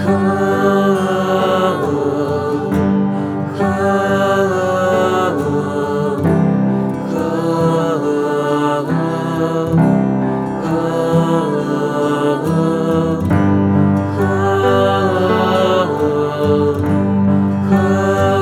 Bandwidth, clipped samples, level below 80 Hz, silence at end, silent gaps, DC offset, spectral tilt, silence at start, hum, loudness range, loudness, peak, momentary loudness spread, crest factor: 14.5 kHz; under 0.1%; -46 dBFS; 0 s; none; under 0.1%; -7.5 dB/octave; 0 s; none; 2 LU; -15 LUFS; -2 dBFS; 4 LU; 14 dB